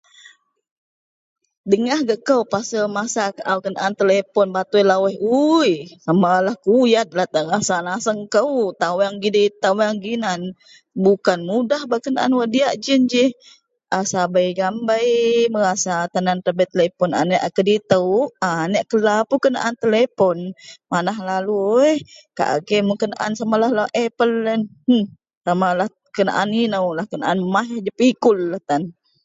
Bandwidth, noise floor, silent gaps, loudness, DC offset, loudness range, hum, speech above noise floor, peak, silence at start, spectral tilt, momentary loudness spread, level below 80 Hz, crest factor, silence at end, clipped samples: 8 kHz; -50 dBFS; 25.37-25.41 s; -19 LUFS; under 0.1%; 3 LU; none; 32 dB; 0 dBFS; 1.65 s; -5 dB/octave; 7 LU; -66 dBFS; 18 dB; 0.35 s; under 0.1%